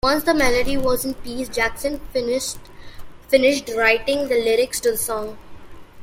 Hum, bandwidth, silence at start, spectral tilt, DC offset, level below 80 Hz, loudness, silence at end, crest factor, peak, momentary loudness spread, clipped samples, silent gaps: none; 16.5 kHz; 0.05 s; -3 dB/octave; under 0.1%; -38 dBFS; -20 LUFS; 0 s; 18 dB; -2 dBFS; 10 LU; under 0.1%; none